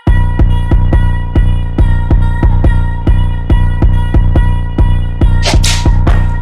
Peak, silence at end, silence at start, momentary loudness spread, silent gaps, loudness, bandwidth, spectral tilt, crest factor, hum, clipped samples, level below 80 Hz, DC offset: 0 dBFS; 0 s; 0.05 s; 3 LU; none; -12 LUFS; 11.5 kHz; -6 dB/octave; 8 dB; none; under 0.1%; -10 dBFS; under 0.1%